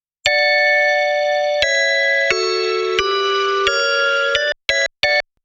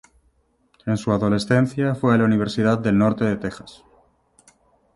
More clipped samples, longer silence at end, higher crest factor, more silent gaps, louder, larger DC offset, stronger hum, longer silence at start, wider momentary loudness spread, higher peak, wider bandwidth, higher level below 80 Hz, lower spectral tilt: neither; second, 0.25 s vs 1.25 s; about the same, 18 dB vs 18 dB; neither; first, -16 LUFS vs -20 LUFS; neither; neither; second, 0.25 s vs 0.85 s; second, 4 LU vs 10 LU; first, 0 dBFS vs -4 dBFS; about the same, 11.5 kHz vs 11.5 kHz; about the same, -52 dBFS vs -52 dBFS; second, -1 dB/octave vs -7.5 dB/octave